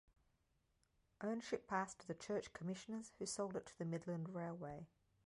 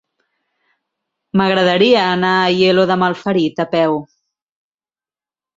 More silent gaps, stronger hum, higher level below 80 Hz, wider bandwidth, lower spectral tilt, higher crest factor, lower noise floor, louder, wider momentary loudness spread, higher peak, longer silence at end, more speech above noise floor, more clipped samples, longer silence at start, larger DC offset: neither; neither; second, -78 dBFS vs -58 dBFS; first, 11 kHz vs 7.8 kHz; about the same, -5 dB/octave vs -6 dB/octave; about the same, 20 dB vs 16 dB; second, -82 dBFS vs under -90 dBFS; second, -47 LUFS vs -14 LUFS; about the same, 7 LU vs 6 LU; second, -28 dBFS vs -2 dBFS; second, 0.4 s vs 1.5 s; second, 36 dB vs over 76 dB; neither; second, 1.2 s vs 1.35 s; neither